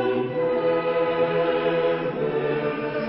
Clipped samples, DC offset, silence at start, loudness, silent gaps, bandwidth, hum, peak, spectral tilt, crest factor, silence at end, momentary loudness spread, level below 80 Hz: under 0.1%; under 0.1%; 0 s; -23 LUFS; none; 5.6 kHz; none; -10 dBFS; -10.5 dB/octave; 12 dB; 0 s; 3 LU; -58 dBFS